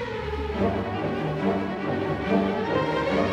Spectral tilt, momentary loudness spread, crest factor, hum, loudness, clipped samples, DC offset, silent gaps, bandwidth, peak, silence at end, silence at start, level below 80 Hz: -7.5 dB/octave; 4 LU; 14 dB; none; -26 LUFS; under 0.1%; under 0.1%; none; 9.8 kHz; -10 dBFS; 0 s; 0 s; -44 dBFS